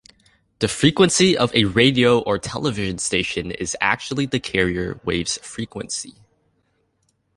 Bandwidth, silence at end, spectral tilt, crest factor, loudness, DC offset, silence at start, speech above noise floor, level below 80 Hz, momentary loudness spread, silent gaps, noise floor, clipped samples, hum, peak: 11.5 kHz; 1.25 s; -4 dB/octave; 20 dB; -20 LUFS; under 0.1%; 0.6 s; 48 dB; -46 dBFS; 12 LU; none; -68 dBFS; under 0.1%; none; -2 dBFS